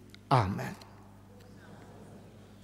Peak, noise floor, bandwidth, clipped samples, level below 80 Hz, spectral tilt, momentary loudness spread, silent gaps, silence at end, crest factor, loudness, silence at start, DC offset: -10 dBFS; -53 dBFS; 15 kHz; under 0.1%; -62 dBFS; -7 dB/octave; 26 LU; none; 0.2 s; 26 dB; -31 LUFS; 0.3 s; under 0.1%